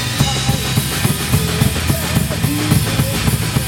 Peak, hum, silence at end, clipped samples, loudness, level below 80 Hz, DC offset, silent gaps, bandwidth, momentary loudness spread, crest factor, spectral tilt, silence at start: 0 dBFS; none; 0 s; under 0.1%; -16 LUFS; -28 dBFS; under 0.1%; none; 17 kHz; 2 LU; 16 dB; -4.5 dB/octave; 0 s